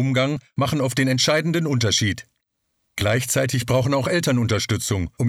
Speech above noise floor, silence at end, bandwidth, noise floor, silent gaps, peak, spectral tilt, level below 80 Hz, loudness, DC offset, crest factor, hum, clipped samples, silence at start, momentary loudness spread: 53 dB; 0 s; 16 kHz; -74 dBFS; none; -6 dBFS; -4.5 dB/octave; -48 dBFS; -21 LUFS; under 0.1%; 16 dB; none; under 0.1%; 0 s; 6 LU